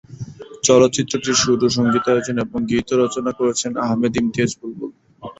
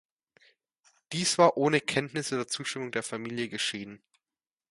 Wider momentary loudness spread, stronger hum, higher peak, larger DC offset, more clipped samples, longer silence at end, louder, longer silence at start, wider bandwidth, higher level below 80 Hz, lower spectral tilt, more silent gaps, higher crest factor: first, 18 LU vs 12 LU; neither; first, -2 dBFS vs -8 dBFS; neither; neither; second, 0.1 s vs 0.75 s; first, -18 LUFS vs -28 LUFS; second, 0.1 s vs 1.1 s; second, 8.2 kHz vs 11.5 kHz; first, -50 dBFS vs -72 dBFS; about the same, -4 dB/octave vs -3.5 dB/octave; neither; second, 18 dB vs 24 dB